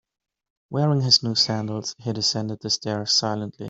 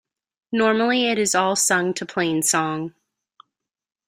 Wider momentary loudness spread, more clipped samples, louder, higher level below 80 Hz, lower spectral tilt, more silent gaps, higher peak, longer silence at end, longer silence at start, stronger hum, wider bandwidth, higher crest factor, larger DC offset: first, 12 LU vs 9 LU; neither; about the same, -22 LUFS vs -20 LUFS; about the same, -64 dBFS vs -66 dBFS; first, -4 dB/octave vs -2.5 dB/octave; neither; about the same, -4 dBFS vs -4 dBFS; second, 0 s vs 1.2 s; first, 0.7 s vs 0.5 s; neither; second, 8 kHz vs 16 kHz; about the same, 20 dB vs 18 dB; neither